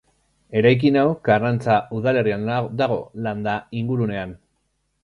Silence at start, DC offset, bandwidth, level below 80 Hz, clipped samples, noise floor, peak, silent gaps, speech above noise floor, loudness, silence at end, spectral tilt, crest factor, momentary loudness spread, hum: 0.5 s; under 0.1%; 10.5 kHz; -54 dBFS; under 0.1%; -70 dBFS; -4 dBFS; none; 50 dB; -21 LUFS; 0.7 s; -8.5 dB/octave; 18 dB; 9 LU; none